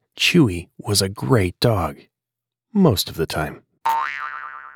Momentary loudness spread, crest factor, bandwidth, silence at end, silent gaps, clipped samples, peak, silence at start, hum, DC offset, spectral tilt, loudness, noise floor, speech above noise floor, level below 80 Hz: 12 LU; 18 dB; 19 kHz; 0.05 s; none; under 0.1%; -4 dBFS; 0.15 s; none; under 0.1%; -5 dB/octave; -20 LUFS; -86 dBFS; 67 dB; -46 dBFS